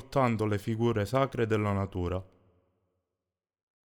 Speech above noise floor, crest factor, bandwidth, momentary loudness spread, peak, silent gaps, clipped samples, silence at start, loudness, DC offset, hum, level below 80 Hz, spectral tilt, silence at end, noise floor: 61 dB; 18 dB; 17.5 kHz; 6 LU; -14 dBFS; none; under 0.1%; 0 s; -30 LUFS; under 0.1%; none; -56 dBFS; -7.5 dB/octave; 1.6 s; -90 dBFS